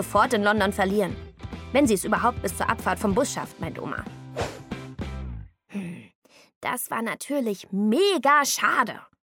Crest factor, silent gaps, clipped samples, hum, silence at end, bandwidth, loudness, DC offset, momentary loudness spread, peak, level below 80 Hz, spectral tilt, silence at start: 20 dB; 6.15-6.22 s, 6.56-6.61 s; under 0.1%; none; 0.2 s; 17.5 kHz; -24 LUFS; under 0.1%; 17 LU; -6 dBFS; -46 dBFS; -4 dB/octave; 0 s